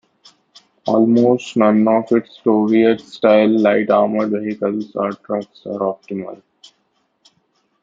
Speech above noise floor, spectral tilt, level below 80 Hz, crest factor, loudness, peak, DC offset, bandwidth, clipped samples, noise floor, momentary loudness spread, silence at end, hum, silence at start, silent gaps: 50 dB; -7.5 dB/octave; -64 dBFS; 16 dB; -16 LUFS; -2 dBFS; under 0.1%; 7.6 kHz; under 0.1%; -65 dBFS; 13 LU; 1.45 s; none; 0.85 s; none